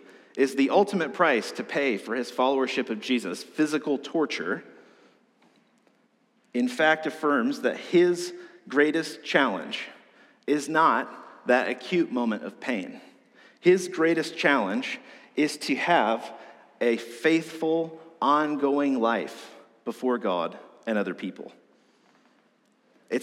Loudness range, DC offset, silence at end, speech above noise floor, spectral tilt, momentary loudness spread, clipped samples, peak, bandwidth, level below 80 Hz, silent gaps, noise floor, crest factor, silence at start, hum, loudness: 5 LU; under 0.1%; 0 s; 41 dB; -4.5 dB/octave; 14 LU; under 0.1%; -6 dBFS; 14.5 kHz; under -90 dBFS; none; -66 dBFS; 20 dB; 0.35 s; none; -26 LUFS